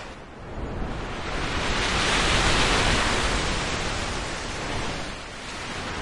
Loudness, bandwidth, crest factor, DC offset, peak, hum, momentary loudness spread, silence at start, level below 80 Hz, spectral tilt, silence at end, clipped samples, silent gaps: -25 LUFS; 11.5 kHz; 18 dB; under 0.1%; -8 dBFS; none; 14 LU; 0 s; -34 dBFS; -3 dB/octave; 0 s; under 0.1%; none